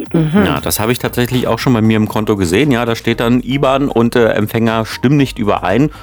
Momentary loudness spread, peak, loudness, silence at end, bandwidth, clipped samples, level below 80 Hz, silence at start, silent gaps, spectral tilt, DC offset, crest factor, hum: 3 LU; 0 dBFS; -13 LUFS; 0 s; over 20 kHz; under 0.1%; -36 dBFS; 0 s; none; -6 dB/octave; under 0.1%; 12 dB; none